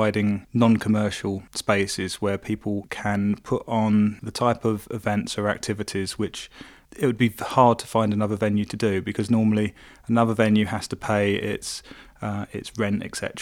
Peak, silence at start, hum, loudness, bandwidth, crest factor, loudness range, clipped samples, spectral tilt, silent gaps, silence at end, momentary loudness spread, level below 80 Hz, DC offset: -2 dBFS; 0 s; none; -24 LUFS; 15.5 kHz; 22 dB; 3 LU; under 0.1%; -6 dB/octave; none; 0 s; 10 LU; -54 dBFS; under 0.1%